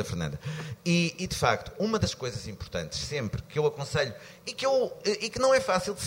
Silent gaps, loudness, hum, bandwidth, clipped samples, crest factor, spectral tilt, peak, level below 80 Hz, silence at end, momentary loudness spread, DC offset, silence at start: none; -29 LUFS; none; 16 kHz; under 0.1%; 20 dB; -4.5 dB/octave; -8 dBFS; -50 dBFS; 0 s; 11 LU; under 0.1%; 0 s